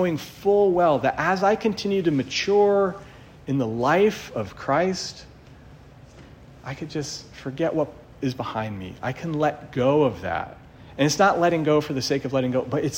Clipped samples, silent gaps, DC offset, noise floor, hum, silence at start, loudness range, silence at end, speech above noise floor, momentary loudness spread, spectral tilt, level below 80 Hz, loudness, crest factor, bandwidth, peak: under 0.1%; none; under 0.1%; -47 dBFS; none; 0 s; 9 LU; 0 s; 24 dB; 14 LU; -5.5 dB/octave; -54 dBFS; -23 LUFS; 18 dB; 16 kHz; -6 dBFS